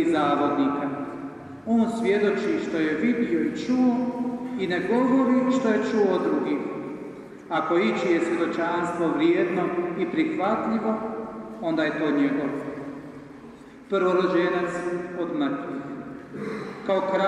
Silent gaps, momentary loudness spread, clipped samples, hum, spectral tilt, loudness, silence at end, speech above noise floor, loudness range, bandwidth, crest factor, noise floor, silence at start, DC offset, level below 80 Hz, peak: none; 14 LU; under 0.1%; none; -6.5 dB/octave; -25 LUFS; 0 s; 21 dB; 4 LU; 10.5 kHz; 16 dB; -44 dBFS; 0 s; under 0.1%; -64 dBFS; -10 dBFS